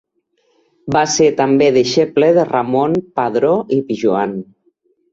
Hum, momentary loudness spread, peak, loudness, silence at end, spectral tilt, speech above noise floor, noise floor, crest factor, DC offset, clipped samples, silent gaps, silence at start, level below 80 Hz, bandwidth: none; 7 LU; -2 dBFS; -15 LUFS; 0.7 s; -5 dB/octave; 49 dB; -63 dBFS; 14 dB; under 0.1%; under 0.1%; none; 0.85 s; -56 dBFS; 7.8 kHz